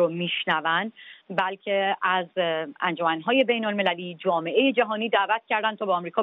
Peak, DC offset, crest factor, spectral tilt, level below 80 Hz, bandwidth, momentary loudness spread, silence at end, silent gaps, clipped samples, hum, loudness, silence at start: -6 dBFS; under 0.1%; 18 dB; -2 dB/octave; -78 dBFS; 5 kHz; 5 LU; 0 s; none; under 0.1%; none; -24 LUFS; 0 s